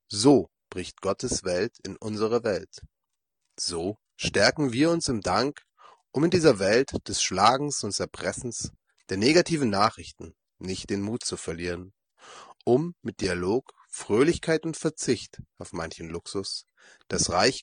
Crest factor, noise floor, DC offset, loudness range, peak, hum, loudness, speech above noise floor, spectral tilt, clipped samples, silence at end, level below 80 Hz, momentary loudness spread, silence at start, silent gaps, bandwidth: 22 dB; -85 dBFS; under 0.1%; 6 LU; -4 dBFS; none; -26 LUFS; 59 dB; -4 dB/octave; under 0.1%; 0 s; -56 dBFS; 16 LU; 0.1 s; none; 10 kHz